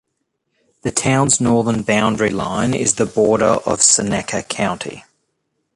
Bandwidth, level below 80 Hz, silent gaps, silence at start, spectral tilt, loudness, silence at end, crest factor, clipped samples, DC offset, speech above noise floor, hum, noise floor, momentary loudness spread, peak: 11.5 kHz; -46 dBFS; none; 0.85 s; -3.5 dB/octave; -16 LUFS; 0.75 s; 18 dB; under 0.1%; under 0.1%; 56 dB; none; -73 dBFS; 9 LU; 0 dBFS